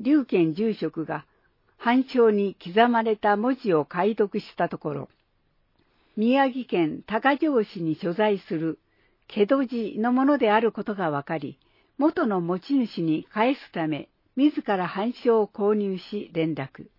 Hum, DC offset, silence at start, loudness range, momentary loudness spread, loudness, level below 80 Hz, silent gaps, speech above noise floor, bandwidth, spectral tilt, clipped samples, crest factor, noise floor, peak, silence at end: none; under 0.1%; 0 s; 3 LU; 11 LU; -25 LUFS; -70 dBFS; none; 44 dB; 5.8 kHz; -9 dB/octave; under 0.1%; 18 dB; -68 dBFS; -6 dBFS; 0.15 s